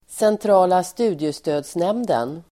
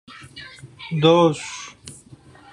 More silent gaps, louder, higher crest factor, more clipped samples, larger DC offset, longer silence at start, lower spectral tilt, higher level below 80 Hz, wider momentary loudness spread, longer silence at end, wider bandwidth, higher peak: neither; about the same, -20 LUFS vs -18 LUFS; about the same, 16 dB vs 20 dB; neither; neither; second, 0.1 s vs 0.35 s; about the same, -5.5 dB/octave vs -5.5 dB/octave; about the same, -62 dBFS vs -60 dBFS; second, 8 LU vs 25 LU; second, 0.1 s vs 0.6 s; first, 16 kHz vs 11 kHz; about the same, -4 dBFS vs -2 dBFS